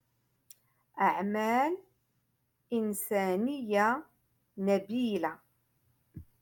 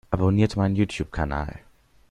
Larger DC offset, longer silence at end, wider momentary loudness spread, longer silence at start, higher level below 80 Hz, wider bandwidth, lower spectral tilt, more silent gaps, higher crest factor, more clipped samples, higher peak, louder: neither; second, 0.2 s vs 0.5 s; about the same, 9 LU vs 9 LU; first, 0.95 s vs 0.1 s; second, -72 dBFS vs -40 dBFS; first, 17.5 kHz vs 10.5 kHz; second, -5.5 dB/octave vs -7.5 dB/octave; neither; about the same, 18 dB vs 18 dB; neither; second, -16 dBFS vs -6 dBFS; second, -31 LUFS vs -24 LUFS